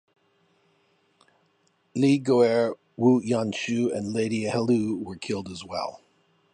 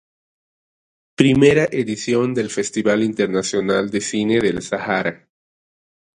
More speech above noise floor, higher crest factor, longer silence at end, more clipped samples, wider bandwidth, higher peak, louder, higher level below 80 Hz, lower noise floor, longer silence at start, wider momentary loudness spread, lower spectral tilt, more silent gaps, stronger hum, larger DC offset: second, 44 dB vs over 72 dB; about the same, 18 dB vs 20 dB; second, 0.6 s vs 1 s; neither; about the same, 10 kHz vs 11 kHz; second, -8 dBFS vs 0 dBFS; second, -25 LUFS vs -18 LUFS; second, -64 dBFS vs -52 dBFS; second, -68 dBFS vs under -90 dBFS; first, 1.95 s vs 1.2 s; first, 12 LU vs 8 LU; about the same, -6 dB/octave vs -5 dB/octave; neither; neither; neither